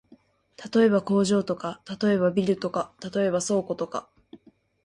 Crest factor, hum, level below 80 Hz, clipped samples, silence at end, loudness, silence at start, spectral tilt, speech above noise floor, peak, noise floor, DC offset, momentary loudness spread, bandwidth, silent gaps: 16 dB; none; -64 dBFS; under 0.1%; 0.5 s; -25 LUFS; 0.6 s; -5.5 dB/octave; 33 dB; -10 dBFS; -58 dBFS; under 0.1%; 11 LU; 11.5 kHz; none